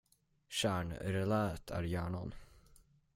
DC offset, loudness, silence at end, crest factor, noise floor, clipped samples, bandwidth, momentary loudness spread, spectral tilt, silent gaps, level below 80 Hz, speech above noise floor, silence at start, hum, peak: under 0.1%; -38 LUFS; 0.4 s; 18 dB; -65 dBFS; under 0.1%; 16 kHz; 7 LU; -5.5 dB/octave; none; -58 dBFS; 29 dB; 0.5 s; none; -22 dBFS